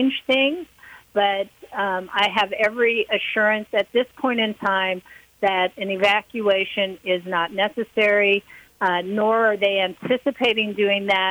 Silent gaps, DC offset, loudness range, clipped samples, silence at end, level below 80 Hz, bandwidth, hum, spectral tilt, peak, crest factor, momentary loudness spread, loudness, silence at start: none; under 0.1%; 2 LU; under 0.1%; 0 s; -64 dBFS; over 20 kHz; none; -5 dB/octave; -6 dBFS; 16 dB; 6 LU; -21 LUFS; 0 s